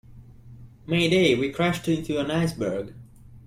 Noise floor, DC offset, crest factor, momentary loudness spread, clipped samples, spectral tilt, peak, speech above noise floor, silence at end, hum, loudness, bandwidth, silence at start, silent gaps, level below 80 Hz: -46 dBFS; under 0.1%; 18 dB; 13 LU; under 0.1%; -5.5 dB/octave; -8 dBFS; 23 dB; 0.05 s; none; -24 LUFS; 15.5 kHz; 0.1 s; none; -52 dBFS